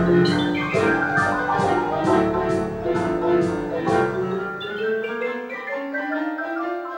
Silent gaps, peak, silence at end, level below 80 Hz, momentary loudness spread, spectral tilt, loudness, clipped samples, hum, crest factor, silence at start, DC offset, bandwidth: none; -6 dBFS; 0 s; -48 dBFS; 8 LU; -6.5 dB/octave; -22 LUFS; under 0.1%; none; 16 dB; 0 s; under 0.1%; 16.5 kHz